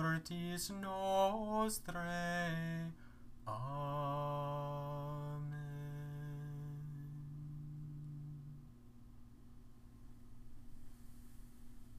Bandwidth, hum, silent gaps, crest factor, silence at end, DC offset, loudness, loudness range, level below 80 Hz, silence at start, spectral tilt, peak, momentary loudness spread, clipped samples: 15.5 kHz; 60 Hz at -65 dBFS; none; 20 dB; 0 s; under 0.1%; -42 LUFS; 17 LU; -60 dBFS; 0 s; -5.5 dB/octave; -24 dBFS; 24 LU; under 0.1%